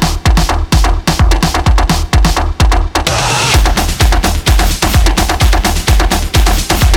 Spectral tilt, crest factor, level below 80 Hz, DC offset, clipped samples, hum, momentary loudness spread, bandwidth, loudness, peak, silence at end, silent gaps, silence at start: -4 dB/octave; 8 dB; -12 dBFS; under 0.1%; under 0.1%; none; 2 LU; 18.5 kHz; -11 LUFS; -2 dBFS; 0 s; none; 0 s